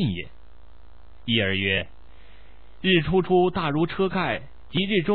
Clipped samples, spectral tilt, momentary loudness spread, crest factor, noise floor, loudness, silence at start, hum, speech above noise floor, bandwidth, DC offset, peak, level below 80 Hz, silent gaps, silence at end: under 0.1%; -9.5 dB/octave; 13 LU; 18 dB; -51 dBFS; -23 LUFS; 0 s; 60 Hz at -50 dBFS; 28 dB; 4.6 kHz; 1%; -6 dBFS; -48 dBFS; none; 0 s